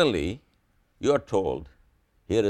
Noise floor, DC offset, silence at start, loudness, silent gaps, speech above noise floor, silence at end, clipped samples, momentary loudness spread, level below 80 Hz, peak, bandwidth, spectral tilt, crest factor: -66 dBFS; under 0.1%; 0 s; -27 LUFS; none; 41 dB; 0 s; under 0.1%; 11 LU; -48 dBFS; -8 dBFS; 11.5 kHz; -6 dB/octave; 20 dB